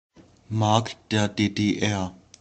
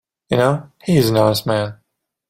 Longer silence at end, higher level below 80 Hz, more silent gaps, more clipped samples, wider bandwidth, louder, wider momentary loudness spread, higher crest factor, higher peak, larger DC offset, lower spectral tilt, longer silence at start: second, 0.25 s vs 0.55 s; second, -58 dBFS vs -50 dBFS; neither; neither; second, 8.8 kHz vs 16.5 kHz; second, -25 LUFS vs -17 LUFS; about the same, 8 LU vs 8 LU; first, 22 dB vs 16 dB; about the same, -2 dBFS vs -2 dBFS; neither; about the same, -5.5 dB/octave vs -6 dB/octave; about the same, 0.2 s vs 0.3 s